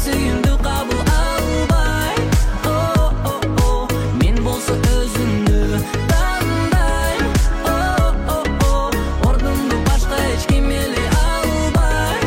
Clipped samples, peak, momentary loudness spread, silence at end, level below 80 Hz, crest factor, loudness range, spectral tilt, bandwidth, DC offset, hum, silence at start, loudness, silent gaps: under 0.1%; -4 dBFS; 2 LU; 0 s; -18 dBFS; 12 dB; 0 LU; -5.5 dB/octave; 16.5 kHz; under 0.1%; none; 0 s; -18 LUFS; none